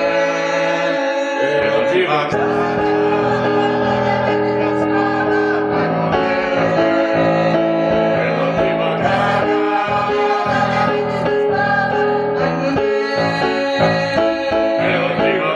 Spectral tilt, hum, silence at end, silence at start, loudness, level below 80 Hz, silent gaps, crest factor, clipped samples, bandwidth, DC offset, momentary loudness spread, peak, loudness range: -6 dB/octave; none; 0 s; 0 s; -16 LUFS; -48 dBFS; none; 14 dB; under 0.1%; 9.6 kHz; under 0.1%; 2 LU; -2 dBFS; 1 LU